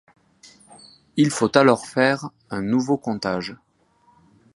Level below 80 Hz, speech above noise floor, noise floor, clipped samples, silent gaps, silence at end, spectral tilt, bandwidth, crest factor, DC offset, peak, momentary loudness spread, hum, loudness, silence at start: -60 dBFS; 40 dB; -60 dBFS; under 0.1%; none; 1 s; -5 dB/octave; 11.5 kHz; 22 dB; under 0.1%; 0 dBFS; 13 LU; none; -21 LUFS; 1.15 s